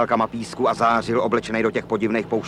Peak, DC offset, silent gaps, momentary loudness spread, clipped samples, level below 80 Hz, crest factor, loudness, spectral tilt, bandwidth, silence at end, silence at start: -6 dBFS; under 0.1%; none; 5 LU; under 0.1%; -52 dBFS; 16 dB; -21 LUFS; -6 dB/octave; 11.5 kHz; 0 s; 0 s